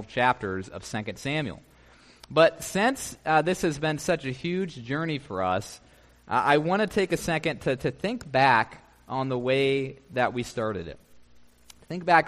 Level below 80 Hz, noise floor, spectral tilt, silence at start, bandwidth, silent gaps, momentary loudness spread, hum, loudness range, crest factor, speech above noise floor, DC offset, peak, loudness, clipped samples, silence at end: -56 dBFS; -55 dBFS; -5 dB/octave; 0 s; 15 kHz; none; 12 LU; none; 3 LU; 22 dB; 29 dB; under 0.1%; -6 dBFS; -26 LUFS; under 0.1%; 0 s